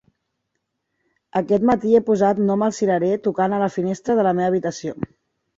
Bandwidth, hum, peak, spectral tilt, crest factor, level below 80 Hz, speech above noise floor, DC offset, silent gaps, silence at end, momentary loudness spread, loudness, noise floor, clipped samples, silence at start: 7.8 kHz; none; -4 dBFS; -7 dB/octave; 16 dB; -58 dBFS; 57 dB; under 0.1%; none; 0.55 s; 10 LU; -20 LUFS; -76 dBFS; under 0.1%; 1.35 s